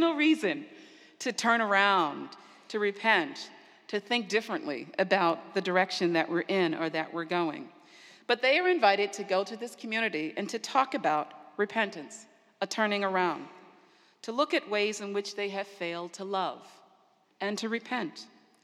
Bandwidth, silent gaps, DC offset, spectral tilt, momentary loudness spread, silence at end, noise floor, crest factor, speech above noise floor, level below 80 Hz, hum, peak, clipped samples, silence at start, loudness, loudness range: 13.5 kHz; none; under 0.1%; -4 dB/octave; 15 LU; 0.4 s; -66 dBFS; 22 dB; 36 dB; under -90 dBFS; none; -8 dBFS; under 0.1%; 0 s; -29 LUFS; 5 LU